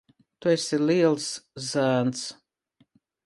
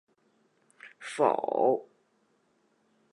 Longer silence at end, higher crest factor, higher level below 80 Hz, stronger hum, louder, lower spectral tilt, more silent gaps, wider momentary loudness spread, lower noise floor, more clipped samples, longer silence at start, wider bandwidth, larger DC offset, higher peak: second, 0.9 s vs 1.3 s; about the same, 18 dB vs 22 dB; first, -72 dBFS vs -88 dBFS; neither; first, -25 LUFS vs -28 LUFS; about the same, -5 dB/octave vs -5 dB/octave; neither; about the same, 12 LU vs 14 LU; second, -67 dBFS vs -71 dBFS; neither; second, 0.4 s vs 0.85 s; about the same, 11.5 kHz vs 11.5 kHz; neither; about the same, -8 dBFS vs -10 dBFS